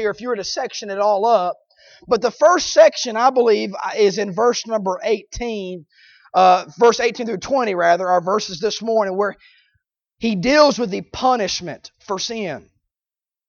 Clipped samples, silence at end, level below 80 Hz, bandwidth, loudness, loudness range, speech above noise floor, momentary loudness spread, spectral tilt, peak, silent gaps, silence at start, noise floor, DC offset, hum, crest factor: under 0.1%; 0.9 s; -50 dBFS; 7.2 kHz; -18 LUFS; 3 LU; over 72 dB; 12 LU; -3.5 dB/octave; -2 dBFS; none; 0 s; under -90 dBFS; under 0.1%; none; 18 dB